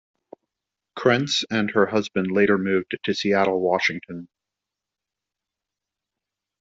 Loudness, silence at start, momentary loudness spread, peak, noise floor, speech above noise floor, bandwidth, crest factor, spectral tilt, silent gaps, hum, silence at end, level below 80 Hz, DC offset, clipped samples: -22 LUFS; 0.95 s; 11 LU; -4 dBFS; -87 dBFS; 65 dB; 7.8 kHz; 20 dB; -5 dB/octave; none; none; 2.35 s; -66 dBFS; under 0.1%; under 0.1%